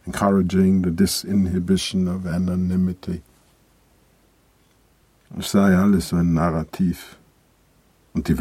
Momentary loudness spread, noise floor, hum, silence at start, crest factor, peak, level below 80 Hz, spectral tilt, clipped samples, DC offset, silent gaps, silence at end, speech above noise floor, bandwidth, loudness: 13 LU; -59 dBFS; none; 0.05 s; 18 dB; -4 dBFS; -46 dBFS; -6.5 dB/octave; under 0.1%; under 0.1%; none; 0 s; 39 dB; 15 kHz; -21 LUFS